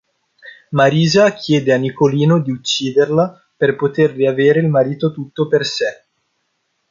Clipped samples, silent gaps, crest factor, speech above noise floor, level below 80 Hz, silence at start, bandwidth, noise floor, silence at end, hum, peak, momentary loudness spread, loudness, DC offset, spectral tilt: under 0.1%; none; 14 dB; 54 dB; -60 dBFS; 0.45 s; 7.6 kHz; -68 dBFS; 1 s; none; -2 dBFS; 8 LU; -15 LUFS; under 0.1%; -6 dB/octave